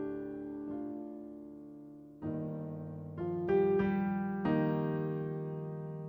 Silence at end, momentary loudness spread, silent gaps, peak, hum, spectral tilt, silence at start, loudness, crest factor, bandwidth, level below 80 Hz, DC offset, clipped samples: 0 s; 18 LU; none; -20 dBFS; none; -10.5 dB/octave; 0 s; -36 LUFS; 16 dB; over 20 kHz; -64 dBFS; under 0.1%; under 0.1%